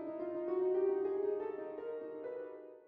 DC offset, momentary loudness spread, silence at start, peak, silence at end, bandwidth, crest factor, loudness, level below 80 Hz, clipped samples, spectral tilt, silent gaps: under 0.1%; 11 LU; 0 s; -26 dBFS; 0.05 s; 3.4 kHz; 12 dB; -38 LUFS; -84 dBFS; under 0.1%; -6.5 dB/octave; none